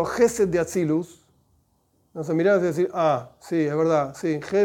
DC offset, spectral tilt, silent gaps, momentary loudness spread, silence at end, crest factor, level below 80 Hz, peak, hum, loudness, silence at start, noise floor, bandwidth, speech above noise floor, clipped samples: under 0.1%; -6 dB/octave; none; 8 LU; 0 s; 16 dB; -58 dBFS; -8 dBFS; none; -23 LUFS; 0 s; -66 dBFS; 17.5 kHz; 44 dB; under 0.1%